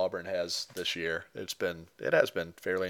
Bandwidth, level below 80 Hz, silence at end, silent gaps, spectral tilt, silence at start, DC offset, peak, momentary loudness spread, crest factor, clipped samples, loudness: 19 kHz; -68 dBFS; 0 s; none; -3 dB/octave; 0 s; under 0.1%; -10 dBFS; 9 LU; 24 dB; under 0.1%; -32 LUFS